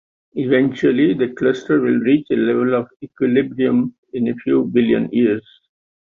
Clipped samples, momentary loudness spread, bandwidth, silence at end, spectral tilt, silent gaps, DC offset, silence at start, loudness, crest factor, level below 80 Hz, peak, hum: under 0.1%; 7 LU; 7 kHz; 0.75 s; -8 dB/octave; 3.98-4.03 s; under 0.1%; 0.35 s; -18 LUFS; 14 dB; -58 dBFS; -4 dBFS; none